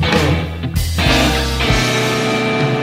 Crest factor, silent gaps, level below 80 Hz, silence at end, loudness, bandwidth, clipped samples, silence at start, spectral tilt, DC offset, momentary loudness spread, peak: 16 dB; none; -24 dBFS; 0 s; -15 LUFS; 16.5 kHz; under 0.1%; 0 s; -4.5 dB/octave; under 0.1%; 6 LU; 0 dBFS